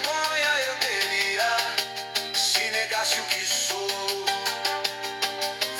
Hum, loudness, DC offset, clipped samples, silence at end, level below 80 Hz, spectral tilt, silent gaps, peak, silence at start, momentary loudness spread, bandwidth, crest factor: none; -24 LUFS; under 0.1%; under 0.1%; 0 s; -70 dBFS; 0.5 dB/octave; none; -6 dBFS; 0 s; 6 LU; 17 kHz; 20 dB